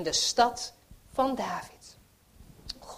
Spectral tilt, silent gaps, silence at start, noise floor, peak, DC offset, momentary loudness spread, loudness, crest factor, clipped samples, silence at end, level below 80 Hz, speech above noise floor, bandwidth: -2 dB/octave; none; 0 s; -57 dBFS; -8 dBFS; under 0.1%; 19 LU; -29 LUFS; 24 dB; under 0.1%; 0 s; -56 dBFS; 28 dB; 15.5 kHz